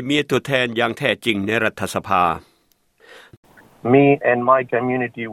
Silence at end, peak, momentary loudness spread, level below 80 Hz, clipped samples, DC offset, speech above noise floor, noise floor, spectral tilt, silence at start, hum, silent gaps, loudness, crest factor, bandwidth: 0 s; -2 dBFS; 8 LU; -58 dBFS; under 0.1%; under 0.1%; 43 dB; -62 dBFS; -5.5 dB/octave; 0 s; none; 3.37-3.43 s; -18 LUFS; 18 dB; 16 kHz